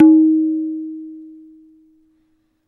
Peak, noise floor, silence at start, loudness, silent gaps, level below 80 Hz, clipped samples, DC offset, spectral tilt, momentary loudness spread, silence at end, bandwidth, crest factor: 0 dBFS; -63 dBFS; 0 s; -16 LUFS; none; -70 dBFS; under 0.1%; under 0.1%; -10.5 dB/octave; 24 LU; 1.4 s; 1.6 kHz; 16 dB